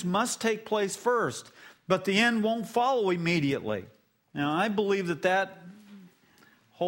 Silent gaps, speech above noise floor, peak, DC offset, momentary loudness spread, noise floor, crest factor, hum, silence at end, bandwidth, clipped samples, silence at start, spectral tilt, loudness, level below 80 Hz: none; 33 dB; -8 dBFS; under 0.1%; 10 LU; -61 dBFS; 20 dB; none; 0 s; 16 kHz; under 0.1%; 0 s; -4.5 dB/octave; -28 LUFS; -70 dBFS